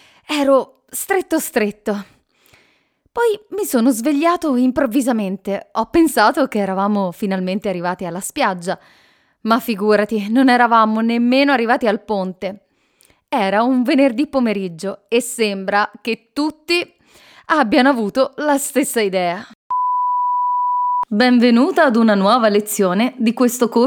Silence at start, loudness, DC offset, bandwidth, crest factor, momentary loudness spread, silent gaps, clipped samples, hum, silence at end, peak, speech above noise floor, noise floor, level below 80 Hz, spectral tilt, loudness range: 0.3 s; -17 LUFS; under 0.1%; over 20 kHz; 16 dB; 11 LU; 19.55-19.70 s; under 0.1%; none; 0 s; 0 dBFS; 44 dB; -60 dBFS; -56 dBFS; -4.5 dB/octave; 5 LU